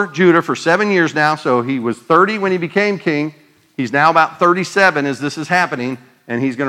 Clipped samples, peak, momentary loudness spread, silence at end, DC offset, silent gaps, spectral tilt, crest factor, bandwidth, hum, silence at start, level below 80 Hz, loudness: under 0.1%; 0 dBFS; 11 LU; 0 s; under 0.1%; none; -5.5 dB/octave; 16 dB; 13 kHz; none; 0 s; -66 dBFS; -15 LUFS